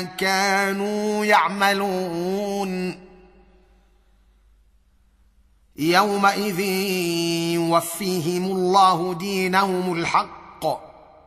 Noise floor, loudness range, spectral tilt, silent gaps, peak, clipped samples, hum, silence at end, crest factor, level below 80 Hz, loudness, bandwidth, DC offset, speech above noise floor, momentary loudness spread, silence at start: -58 dBFS; 10 LU; -4.5 dB/octave; none; -2 dBFS; under 0.1%; none; 0.35 s; 20 dB; -58 dBFS; -21 LUFS; 15.5 kHz; under 0.1%; 37 dB; 10 LU; 0 s